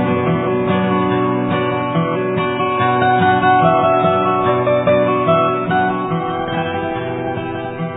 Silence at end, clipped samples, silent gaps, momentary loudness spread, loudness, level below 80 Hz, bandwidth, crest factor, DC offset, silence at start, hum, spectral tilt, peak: 0 s; under 0.1%; none; 8 LU; -16 LUFS; -50 dBFS; 4 kHz; 14 dB; under 0.1%; 0 s; none; -11 dB/octave; -2 dBFS